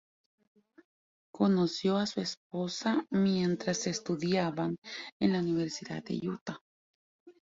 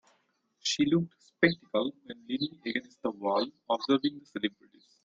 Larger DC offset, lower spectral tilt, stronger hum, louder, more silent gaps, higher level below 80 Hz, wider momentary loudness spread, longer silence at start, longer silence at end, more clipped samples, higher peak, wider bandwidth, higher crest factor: neither; about the same, -5.5 dB/octave vs -4.5 dB/octave; neither; about the same, -32 LUFS vs -31 LUFS; first, 2.37-2.50 s, 4.78-4.82 s, 5.12-5.20 s, 6.41-6.46 s, 6.61-7.26 s vs none; about the same, -70 dBFS vs -70 dBFS; about the same, 10 LU vs 9 LU; first, 1.35 s vs 0.65 s; second, 0.15 s vs 0.55 s; neither; second, -16 dBFS vs -8 dBFS; about the same, 7.8 kHz vs 7.8 kHz; second, 18 dB vs 24 dB